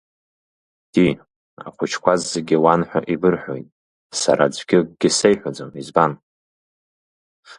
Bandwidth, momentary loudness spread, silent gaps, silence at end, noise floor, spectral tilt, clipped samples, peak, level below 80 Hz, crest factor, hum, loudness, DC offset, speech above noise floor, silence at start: 11.5 kHz; 16 LU; 1.36-1.57 s, 3.72-4.10 s, 6.22-7.43 s; 0.05 s; under -90 dBFS; -4.5 dB/octave; under 0.1%; 0 dBFS; -56 dBFS; 20 dB; none; -19 LUFS; under 0.1%; over 72 dB; 0.95 s